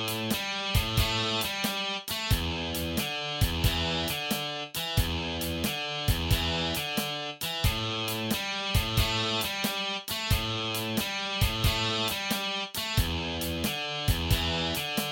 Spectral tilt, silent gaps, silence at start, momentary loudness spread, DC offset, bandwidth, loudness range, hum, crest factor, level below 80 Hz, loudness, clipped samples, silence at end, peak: -3.5 dB/octave; none; 0 s; 4 LU; under 0.1%; 17 kHz; 1 LU; none; 18 dB; -38 dBFS; -29 LUFS; under 0.1%; 0 s; -12 dBFS